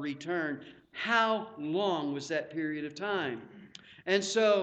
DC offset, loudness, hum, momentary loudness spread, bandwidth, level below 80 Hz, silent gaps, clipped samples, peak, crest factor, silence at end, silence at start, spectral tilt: under 0.1%; -32 LUFS; none; 17 LU; 9 kHz; -76 dBFS; none; under 0.1%; -14 dBFS; 18 dB; 0 s; 0 s; -4 dB/octave